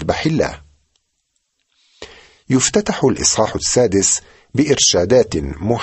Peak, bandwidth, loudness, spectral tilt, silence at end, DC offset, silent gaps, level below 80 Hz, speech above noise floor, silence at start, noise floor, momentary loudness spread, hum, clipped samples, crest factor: -2 dBFS; 8.6 kHz; -15 LUFS; -3.5 dB/octave; 0 s; under 0.1%; none; -40 dBFS; 54 dB; 0 s; -70 dBFS; 8 LU; none; under 0.1%; 16 dB